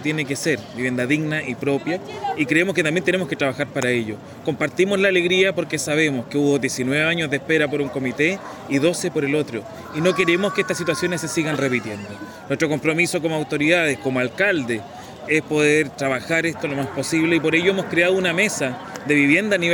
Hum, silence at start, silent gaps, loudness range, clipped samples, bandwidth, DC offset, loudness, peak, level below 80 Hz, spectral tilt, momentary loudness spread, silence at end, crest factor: none; 0 s; none; 2 LU; under 0.1%; 17 kHz; under 0.1%; -20 LUFS; -4 dBFS; -62 dBFS; -4.5 dB/octave; 9 LU; 0 s; 18 dB